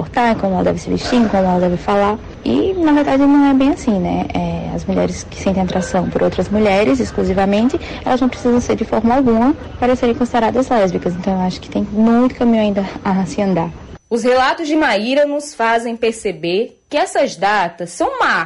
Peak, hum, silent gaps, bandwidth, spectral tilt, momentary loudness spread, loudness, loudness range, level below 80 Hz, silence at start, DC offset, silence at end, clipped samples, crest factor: -6 dBFS; none; none; 11.5 kHz; -6 dB/octave; 7 LU; -16 LUFS; 2 LU; -36 dBFS; 0 s; under 0.1%; 0 s; under 0.1%; 10 dB